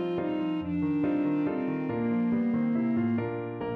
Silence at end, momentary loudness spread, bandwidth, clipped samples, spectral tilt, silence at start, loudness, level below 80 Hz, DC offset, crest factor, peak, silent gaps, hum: 0 s; 4 LU; 4.4 kHz; under 0.1%; -10 dB/octave; 0 s; -29 LUFS; -60 dBFS; under 0.1%; 10 dB; -18 dBFS; none; none